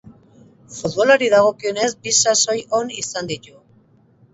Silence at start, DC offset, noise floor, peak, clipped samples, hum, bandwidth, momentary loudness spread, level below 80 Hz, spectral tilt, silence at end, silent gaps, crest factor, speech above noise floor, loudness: 0.05 s; under 0.1%; -54 dBFS; 0 dBFS; under 0.1%; none; 8.2 kHz; 15 LU; -60 dBFS; -1.5 dB/octave; 0.95 s; none; 20 dB; 36 dB; -17 LUFS